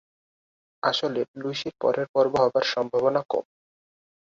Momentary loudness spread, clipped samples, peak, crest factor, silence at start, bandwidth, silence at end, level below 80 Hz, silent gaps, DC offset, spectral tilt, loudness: 9 LU; under 0.1%; -6 dBFS; 20 dB; 0.85 s; 7.6 kHz; 0.9 s; -66 dBFS; 1.28-1.34 s, 2.09-2.14 s; under 0.1%; -4.5 dB/octave; -25 LUFS